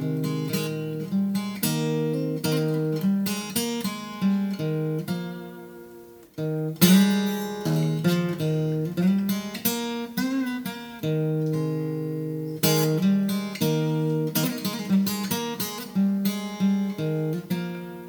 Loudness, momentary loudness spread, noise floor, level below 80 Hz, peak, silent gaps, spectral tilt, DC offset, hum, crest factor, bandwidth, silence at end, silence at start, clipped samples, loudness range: -25 LUFS; 8 LU; -46 dBFS; -66 dBFS; -2 dBFS; none; -5.5 dB/octave; under 0.1%; none; 22 dB; over 20 kHz; 0 s; 0 s; under 0.1%; 4 LU